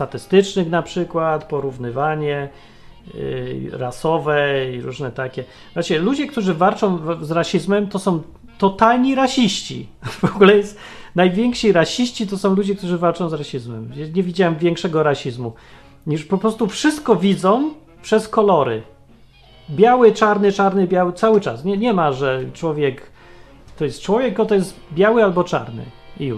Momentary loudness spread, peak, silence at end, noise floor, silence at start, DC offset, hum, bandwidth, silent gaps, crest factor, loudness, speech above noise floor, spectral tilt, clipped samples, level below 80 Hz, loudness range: 14 LU; 0 dBFS; 0 s; -47 dBFS; 0 s; under 0.1%; none; 13 kHz; none; 18 dB; -18 LUFS; 29 dB; -6 dB/octave; under 0.1%; -48 dBFS; 6 LU